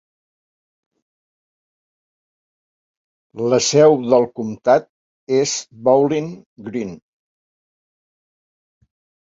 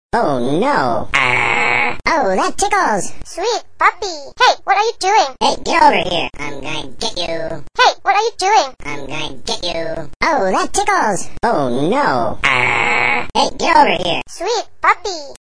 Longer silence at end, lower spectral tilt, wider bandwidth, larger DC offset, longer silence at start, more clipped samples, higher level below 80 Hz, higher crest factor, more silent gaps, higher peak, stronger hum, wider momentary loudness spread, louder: first, 2.4 s vs 0.05 s; first, -4.5 dB/octave vs -3 dB/octave; second, 7.8 kHz vs 10.5 kHz; second, under 0.1% vs 5%; first, 3.35 s vs 0.1 s; neither; second, -64 dBFS vs -40 dBFS; about the same, 20 dB vs 16 dB; first, 4.89-5.27 s, 6.46-6.56 s vs 10.16-10.20 s; about the same, -2 dBFS vs 0 dBFS; neither; first, 16 LU vs 11 LU; about the same, -17 LUFS vs -15 LUFS